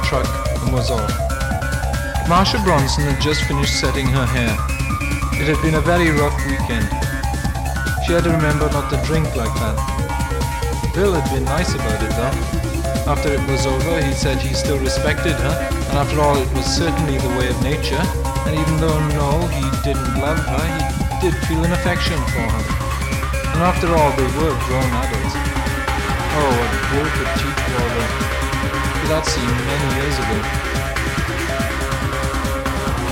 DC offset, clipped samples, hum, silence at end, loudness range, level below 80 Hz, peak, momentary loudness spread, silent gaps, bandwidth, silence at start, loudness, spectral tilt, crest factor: under 0.1%; under 0.1%; none; 0 s; 2 LU; -24 dBFS; -2 dBFS; 5 LU; none; 17 kHz; 0 s; -19 LUFS; -5 dB/octave; 16 dB